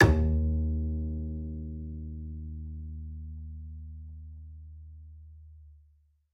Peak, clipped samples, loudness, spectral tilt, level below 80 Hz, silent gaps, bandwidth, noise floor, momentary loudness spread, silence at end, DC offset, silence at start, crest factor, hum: -6 dBFS; under 0.1%; -34 LUFS; -7 dB/octave; -36 dBFS; none; 6.8 kHz; -64 dBFS; 22 LU; 0.55 s; under 0.1%; 0 s; 26 dB; none